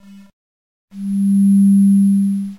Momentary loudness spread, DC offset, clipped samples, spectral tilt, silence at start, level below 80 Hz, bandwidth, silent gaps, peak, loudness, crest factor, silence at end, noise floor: 10 LU; under 0.1%; under 0.1%; -9 dB/octave; 0.95 s; -66 dBFS; 12 kHz; none; -6 dBFS; -13 LUFS; 8 dB; 0.05 s; under -90 dBFS